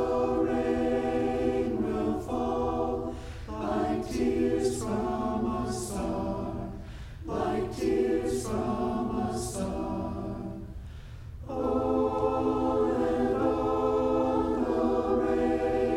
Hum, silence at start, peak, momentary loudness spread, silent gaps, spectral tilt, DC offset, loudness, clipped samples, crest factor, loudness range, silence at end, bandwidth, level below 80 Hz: none; 0 s; -14 dBFS; 11 LU; none; -6.5 dB/octave; under 0.1%; -29 LUFS; under 0.1%; 14 dB; 5 LU; 0 s; 15.5 kHz; -44 dBFS